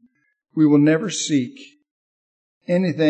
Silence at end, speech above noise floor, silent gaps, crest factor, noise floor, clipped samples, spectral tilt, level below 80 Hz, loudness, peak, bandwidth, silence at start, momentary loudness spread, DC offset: 0 s; over 72 dB; 1.91-2.61 s; 16 dB; under -90 dBFS; under 0.1%; -5.5 dB/octave; -74 dBFS; -19 LUFS; -4 dBFS; 8.8 kHz; 0.55 s; 16 LU; under 0.1%